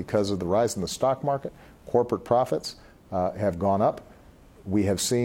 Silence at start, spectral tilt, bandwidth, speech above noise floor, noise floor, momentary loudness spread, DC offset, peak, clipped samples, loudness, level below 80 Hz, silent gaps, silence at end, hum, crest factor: 0 s; -5.5 dB/octave; 17 kHz; 26 dB; -51 dBFS; 9 LU; under 0.1%; -8 dBFS; under 0.1%; -26 LUFS; -56 dBFS; none; 0 s; none; 18 dB